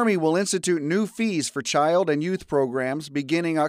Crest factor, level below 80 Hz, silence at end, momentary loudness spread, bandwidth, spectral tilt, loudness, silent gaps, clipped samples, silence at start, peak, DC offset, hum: 14 dB; -62 dBFS; 0 s; 5 LU; 15.5 kHz; -4.5 dB/octave; -24 LUFS; none; under 0.1%; 0 s; -10 dBFS; under 0.1%; none